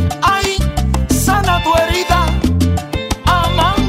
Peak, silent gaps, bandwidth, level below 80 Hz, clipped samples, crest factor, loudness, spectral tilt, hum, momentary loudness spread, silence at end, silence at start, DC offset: 0 dBFS; none; 16.5 kHz; -20 dBFS; under 0.1%; 12 dB; -14 LUFS; -5 dB/octave; none; 4 LU; 0 s; 0 s; under 0.1%